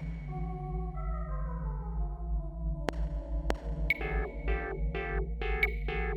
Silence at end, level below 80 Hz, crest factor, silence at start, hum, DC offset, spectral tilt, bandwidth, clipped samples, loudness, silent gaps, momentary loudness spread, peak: 0 s; -34 dBFS; 22 dB; 0 s; none; under 0.1%; -7 dB/octave; 13 kHz; under 0.1%; -35 LUFS; none; 7 LU; -12 dBFS